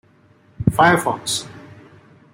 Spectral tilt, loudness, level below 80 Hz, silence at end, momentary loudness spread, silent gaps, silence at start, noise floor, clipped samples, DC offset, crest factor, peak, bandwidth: -4.5 dB/octave; -18 LUFS; -46 dBFS; 0.7 s; 10 LU; none; 0.6 s; -53 dBFS; under 0.1%; under 0.1%; 20 dB; 0 dBFS; 16.5 kHz